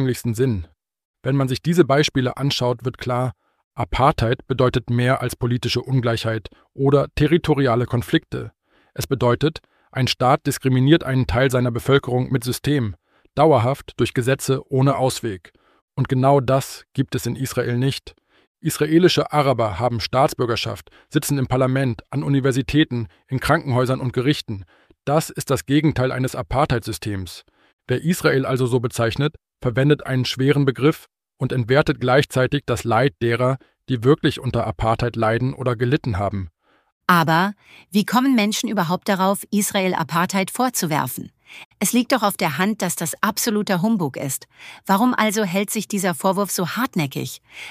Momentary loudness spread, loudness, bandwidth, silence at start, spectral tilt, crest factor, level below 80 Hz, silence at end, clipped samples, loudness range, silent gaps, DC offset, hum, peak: 10 LU; -20 LUFS; 15.5 kHz; 0 s; -5.5 dB/octave; 18 dB; -44 dBFS; 0 s; under 0.1%; 2 LU; 1.05-1.14 s, 3.64-3.71 s, 15.82-15.88 s, 18.47-18.55 s, 27.73-27.79 s, 36.92-37.01 s, 41.65-41.71 s; under 0.1%; none; -2 dBFS